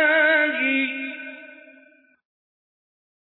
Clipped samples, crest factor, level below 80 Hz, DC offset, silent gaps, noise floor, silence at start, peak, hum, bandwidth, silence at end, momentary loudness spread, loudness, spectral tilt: under 0.1%; 16 dB; under -90 dBFS; under 0.1%; none; -55 dBFS; 0 s; -8 dBFS; none; 4.1 kHz; 1.8 s; 20 LU; -20 LUFS; -5 dB/octave